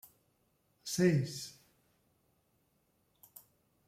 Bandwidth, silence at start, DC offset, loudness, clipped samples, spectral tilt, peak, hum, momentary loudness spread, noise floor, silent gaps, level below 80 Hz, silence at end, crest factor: 16.5 kHz; 0.85 s; under 0.1%; -33 LUFS; under 0.1%; -5.5 dB/octave; -18 dBFS; none; 26 LU; -76 dBFS; none; -74 dBFS; 2.35 s; 22 dB